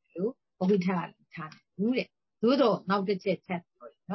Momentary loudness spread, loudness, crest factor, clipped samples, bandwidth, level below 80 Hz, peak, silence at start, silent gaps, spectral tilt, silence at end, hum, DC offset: 17 LU; -29 LUFS; 18 dB; under 0.1%; 6 kHz; -76 dBFS; -12 dBFS; 0.15 s; none; -8 dB/octave; 0 s; none; under 0.1%